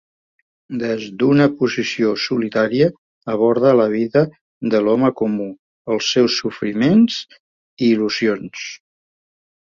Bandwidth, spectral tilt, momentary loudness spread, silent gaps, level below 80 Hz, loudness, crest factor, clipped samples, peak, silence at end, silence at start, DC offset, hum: 7.4 kHz; -5.5 dB/octave; 13 LU; 2.98-3.21 s, 4.41-4.61 s, 5.59-5.85 s, 7.40-7.77 s; -58 dBFS; -18 LUFS; 16 dB; under 0.1%; -2 dBFS; 0.95 s; 0.7 s; under 0.1%; none